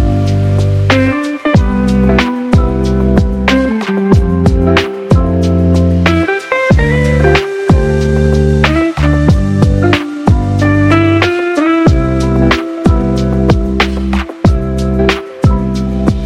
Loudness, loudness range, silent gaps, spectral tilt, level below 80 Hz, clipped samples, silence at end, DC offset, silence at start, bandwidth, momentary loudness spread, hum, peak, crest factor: -11 LUFS; 2 LU; none; -7 dB/octave; -18 dBFS; under 0.1%; 0 s; 0.1%; 0 s; 11.5 kHz; 3 LU; none; 0 dBFS; 10 dB